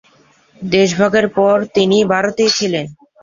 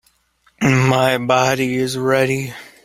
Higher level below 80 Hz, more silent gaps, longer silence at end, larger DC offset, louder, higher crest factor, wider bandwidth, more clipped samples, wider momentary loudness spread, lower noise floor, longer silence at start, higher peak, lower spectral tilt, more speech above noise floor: about the same, -54 dBFS vs -52 dBFS; neither; about the same, 0.3 s vs 0.2 s; neither; first, -14 LUFS vs -17 LUFS; about the same, 14 dB vs 16 dB; second, 7.6 kHz vs 16 kHz; neither; about the same, 8 LU vs 6 LU; second, -51 dBFS vs -59 dBFS; about the same, 0.6 s vs 0.6 s; about the same, 0 dBFS vs 0 dBFS; about the same, -4.5 dB/octave vs -5.5 dB/octave; second, 38 dB vs 42 dB